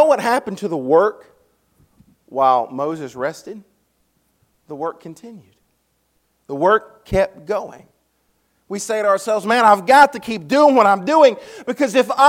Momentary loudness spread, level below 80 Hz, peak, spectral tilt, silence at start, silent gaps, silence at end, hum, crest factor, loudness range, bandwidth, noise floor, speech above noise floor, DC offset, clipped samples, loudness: 18 LU; -50 dBFS; 0 dBFS; -4.5 dB/octave; 0 s; none; 0 s; none; 18 dB; 15 LU; 16.5 kHz; -66 dBFS; 49 dB; under 0.1%; under 0.1%; -17 LUFS